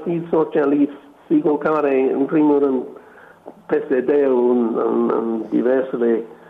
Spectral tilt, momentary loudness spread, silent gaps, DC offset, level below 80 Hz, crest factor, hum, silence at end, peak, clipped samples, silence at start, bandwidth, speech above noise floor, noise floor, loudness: -9.5 dB/octave; 5 LU; none; under 0.1%; -66 dBFS; 12 dB; none; 0.15 s; -6 dBFS; under 0.1%; 0 s; 4 kHz; 26 dB; -44 dBFS; -18 LUFS